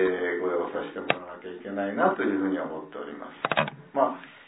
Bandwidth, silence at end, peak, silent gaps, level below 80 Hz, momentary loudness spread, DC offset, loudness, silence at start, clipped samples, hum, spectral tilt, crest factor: 4 kHz; 0.05 s; -4 dBFS; none; -70 dBFS; 13 LU; under 0.1%; -28 LUFS; 0 s; under 0.1%; none; -9 dB/octave; 24 dB